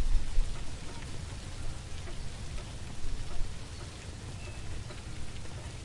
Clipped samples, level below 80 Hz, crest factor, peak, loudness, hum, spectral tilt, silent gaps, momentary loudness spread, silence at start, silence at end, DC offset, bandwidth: under 0.1%; -36 dBFS; 18 dB; -14 dBFS; -42 LUFS; none; -4.5 dB/octave; none; 5 LU; 0 s; 0 s; under 0.1%; 11.5 kHz